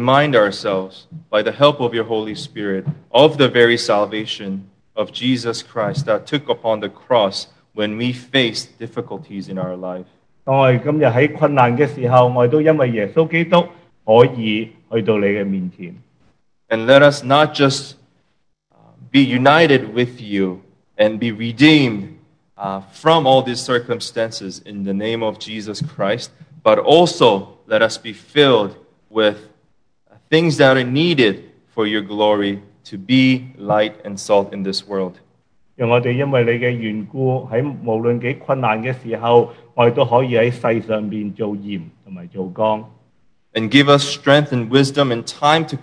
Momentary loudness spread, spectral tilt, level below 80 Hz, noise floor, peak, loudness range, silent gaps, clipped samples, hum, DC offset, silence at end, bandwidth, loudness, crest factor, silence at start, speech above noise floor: 16 LU; -5.5 dB/octave; -62 dBFS; -66 dBFS; 0 dBFS; 5 LU; none; under 0.1%; none; under 0.1%; 0 s; 11 kHz; -16 LUFS; 16 dB; 0 s; 50 dB